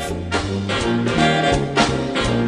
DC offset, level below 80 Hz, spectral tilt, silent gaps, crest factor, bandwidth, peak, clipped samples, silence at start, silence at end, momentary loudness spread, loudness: under 0.1%; -34 dBFS; -5 dB/octave; none; 16 dB; 13 kHz; -2 dBFS; under 0.1%; 0 s; 0 s; 6 LU; -19 LUFS